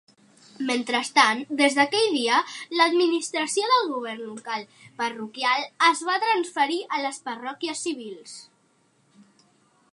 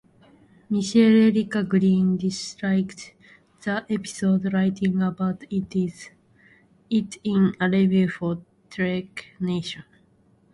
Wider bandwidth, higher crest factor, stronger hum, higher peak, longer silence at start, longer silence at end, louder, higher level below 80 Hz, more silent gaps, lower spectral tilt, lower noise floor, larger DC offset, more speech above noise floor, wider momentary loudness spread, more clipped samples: about the same, 11.5 kHz vs 11.5 kHz; first, 22 dB vs 16 dB; neither; about the same, -4 dBFS vs -6 dBFS; about the same, 0.6 s vs 0.7 s; first, 1.5 s vs 0.75 s; about the same, -23 LUFS vs -23 LUFS; second, -84 dBFS vs -60 dBFS; neither; second, -1.5 dB/octave vs -6.5 dB/octave; first, -65 dBFS vs -60 dBFS; neither; about the same, 40 dB vs 37 dB; about the same, 13 LU vs 14 LU; neither